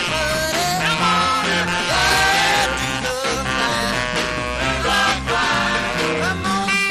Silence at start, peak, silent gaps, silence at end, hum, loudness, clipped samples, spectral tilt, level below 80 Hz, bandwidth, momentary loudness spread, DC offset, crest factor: 0 s; -4 dBFS; none; 0 s; none; -18 LUFS; under 0.1%; -2.5 dB/octave; -36 dBFS; 15.5 kHz; 6 LU; under 0.1%; 16 dB